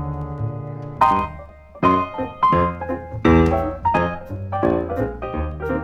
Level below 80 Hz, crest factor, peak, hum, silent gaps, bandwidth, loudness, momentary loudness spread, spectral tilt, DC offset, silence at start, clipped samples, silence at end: -34 dBFS; 18 dB; -2 dBFS; none; none; 9 kHz; -21 LUFS; 12 LU; -8.5 dB/octave; under 0.1%; 0 s; under 0.1%; 0 s